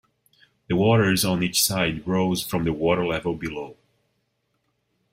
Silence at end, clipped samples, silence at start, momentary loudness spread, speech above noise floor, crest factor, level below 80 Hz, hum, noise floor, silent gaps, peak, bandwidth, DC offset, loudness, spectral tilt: 1.4 s; under 0.1%; 0.7 s; 11 LU; 50 dB; 18 dB; -52 dBFS; none; -73 dBFS; none; -6 dBFS; 16 kHz; under 0.1%; -22 LUFS; -4.5 dB/octave